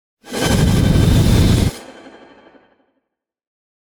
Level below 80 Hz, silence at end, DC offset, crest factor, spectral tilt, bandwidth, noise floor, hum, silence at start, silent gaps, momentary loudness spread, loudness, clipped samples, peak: -24 dBFS; 2.05 s; under 0.1%; 14 dB; -6 dB/octave; over 20 kHz; -76 dBFS; none; 0.25 s; none; 11 LU; -15 LUFS; under 0.1%; -2 dBFS